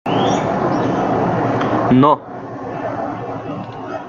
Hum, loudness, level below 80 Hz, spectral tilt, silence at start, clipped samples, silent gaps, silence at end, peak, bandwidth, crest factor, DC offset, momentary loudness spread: none; -18 LUFS; -48 dBFS; -7 dB/octave; 0.05 s; under 0.1%; none; 0 s; -2 dBFS; 7.4 kHz; 16 dB; under 0.1%; 15 LU